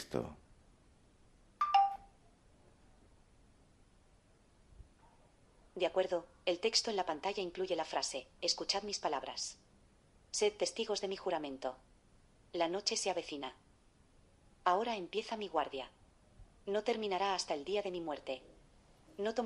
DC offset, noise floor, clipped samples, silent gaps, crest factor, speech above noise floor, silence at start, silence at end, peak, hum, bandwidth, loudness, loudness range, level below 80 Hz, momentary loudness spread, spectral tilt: under 0.1%; -67 dBFS; under 0.1%; none; 22 dB; 30 dB; 0 s; 0 s; -16 dBFS; none; 11.5 kHz; -37 LUFS; 4 LU; -68 dBFS; 13 LU; -2.5 dB/octave